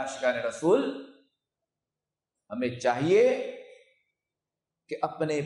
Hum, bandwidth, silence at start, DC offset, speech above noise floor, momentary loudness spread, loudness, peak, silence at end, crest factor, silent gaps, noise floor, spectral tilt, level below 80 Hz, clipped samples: none; 11.5 kHz; 0 s; under 0.1%; 63 dB; 18 LU; -27 LUFS; -12 dBFS; 0 s; 18 dB; none; -90 dBFS; -5.5 dB/octave; -74 dBFS; under 0.1%